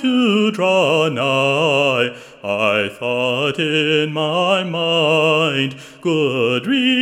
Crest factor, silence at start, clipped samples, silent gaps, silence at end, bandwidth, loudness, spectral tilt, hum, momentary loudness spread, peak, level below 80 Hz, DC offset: 14 dB; 0 s; under 0.1%; none; 0 s; 16 kHz; -17 LUFS; -5 dB/octave; none; 6 LU; -2 dBFS; -68 dBFS; under 0.1%